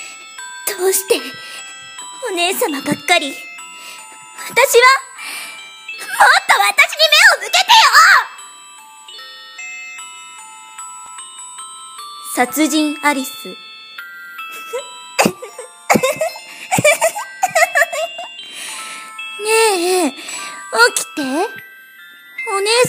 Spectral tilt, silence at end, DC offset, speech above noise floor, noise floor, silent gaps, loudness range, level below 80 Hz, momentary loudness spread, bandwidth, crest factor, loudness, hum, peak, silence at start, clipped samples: -1.5 dB/octave; 0 s; under 0.1%; 27 dB; -40 dBFS; none; 11 LU; -64 dBFS; 23 LU; 16.5 kHz; 16 dB; -13 LUFS; none; 0 dBFS; 0 s; under 0.1%